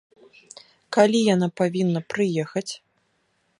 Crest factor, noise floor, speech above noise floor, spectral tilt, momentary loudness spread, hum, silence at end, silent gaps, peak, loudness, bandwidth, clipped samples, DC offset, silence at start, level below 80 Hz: 20 dB; -69 dBFS; 47 dB; -5.5 dB/octave; 12 LU; none; 0.85 s; none; -4 dBFS; -22 LUFS; 11.5 kHz; under 0.1%; under 0.1%; 0.9 s; -70 dBFS